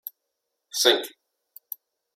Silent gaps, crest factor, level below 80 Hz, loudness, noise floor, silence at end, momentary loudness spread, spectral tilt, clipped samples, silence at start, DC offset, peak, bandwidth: none; 26 dB; -88 dBFS; -22 LUFS; -81 dBFS; 1.05 s; 20 LU; 0.5 dB/octave; under 0.1%; 0.75 s; under 0.1%; -4 dBFS; 16.5 kHz